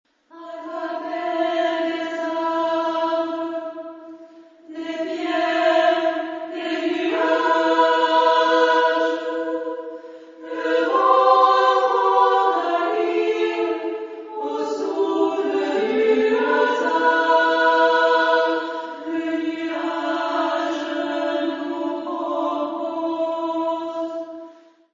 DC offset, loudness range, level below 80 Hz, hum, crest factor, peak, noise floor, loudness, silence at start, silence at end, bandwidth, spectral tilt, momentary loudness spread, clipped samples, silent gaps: under 0.1%; 7 LU; -74 dBFS; none; 18 dB; -4 dBFS; -46 dBFS; -20 LUFS; 0.35 s; 0.4 s; 7.6 kHz; -3 dB/octave; 14 LU; under 0.1%; none